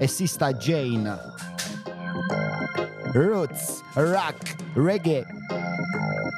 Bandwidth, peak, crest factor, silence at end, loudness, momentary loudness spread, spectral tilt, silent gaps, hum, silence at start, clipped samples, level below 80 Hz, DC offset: 15.5 kHz; -6 dBFS; 18 dB; 0 s; -26 LUFS; 10 LU; -5.5 dB/octave; none; none; 0 s; under 0.1%; -66 dBFS; under 0.1%